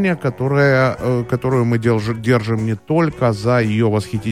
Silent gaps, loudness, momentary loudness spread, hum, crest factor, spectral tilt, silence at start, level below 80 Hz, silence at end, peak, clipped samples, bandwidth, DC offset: none; -17 LUFS; 6 LU; none; 14 dB; -7.5 dB/octave; 0 s; -46 dBFS; 0 s; -2 dBFS; under 0.1%; 13 kHz; 0.3%